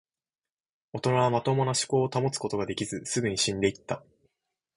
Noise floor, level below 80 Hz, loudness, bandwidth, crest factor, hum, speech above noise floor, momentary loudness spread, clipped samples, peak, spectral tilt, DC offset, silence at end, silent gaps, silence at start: under -90 dBFS; -60 dBFS; -28 LUFS; 11.5 kHz; 20 dB; none; over 63 dB; 11 LU; under 0.1%; -10 dBFS; -4.5 dB/octave; under 0.1%; 0.75 s; none; 0.95 s